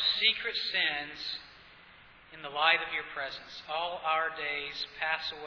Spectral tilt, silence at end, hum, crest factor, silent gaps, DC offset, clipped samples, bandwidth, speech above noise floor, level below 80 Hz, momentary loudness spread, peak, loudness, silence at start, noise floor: -2 dB/octave; 0 s; none; 22 dB; none; under 0.1%; under 0.1%; 5.4 kHz; 23 dB; -68 dBFS; 15 LU; -10 dBFS; -30 LUFS; 0 s; -56 dBFS